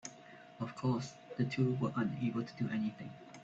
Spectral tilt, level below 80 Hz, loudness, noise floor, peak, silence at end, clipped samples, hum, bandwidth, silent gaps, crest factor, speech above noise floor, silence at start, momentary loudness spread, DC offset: -7 dB/octave; -74 dBFS; -37 LUFS; -56 dBFS; -20 dBFS; 0 s; under 0.1%; none; 8 kHz; none; 16 dB; 20 dB; 0.05 s; 16 LU; under 0.1%